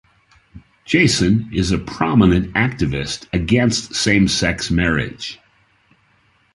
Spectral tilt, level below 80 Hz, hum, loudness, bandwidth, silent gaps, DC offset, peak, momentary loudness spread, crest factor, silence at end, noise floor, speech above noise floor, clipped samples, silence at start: -5 dB/octave; -34 dBFS; none; -17 LUFS; 11.5 kHz; none; under 0.1%; -2 dBFS; 8 LU; 16 dB; 1.2 s; -58 dBFS; 41 dB; under 0.1%; 0.55 s